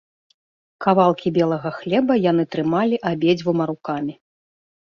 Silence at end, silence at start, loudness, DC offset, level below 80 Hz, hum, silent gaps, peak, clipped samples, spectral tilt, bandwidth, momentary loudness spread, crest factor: 0.7 s; 0.8 s; -20 LUFS; under 0.1%; -62 dBFS; none; none; -2 dBFS; under 0.1%; -8 dB/octave; 7 kHz; 9 LU; 18 dB